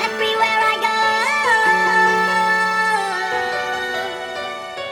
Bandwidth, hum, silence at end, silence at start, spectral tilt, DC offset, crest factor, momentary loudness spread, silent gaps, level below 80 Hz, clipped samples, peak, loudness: 19 kHz; none; 0 s; 0 s; -2 dB/octave; under 0.1%; 14 dB; 12 LU; none; -60 dBFS; under 0.1%; -4 dBFS; -17 LUFS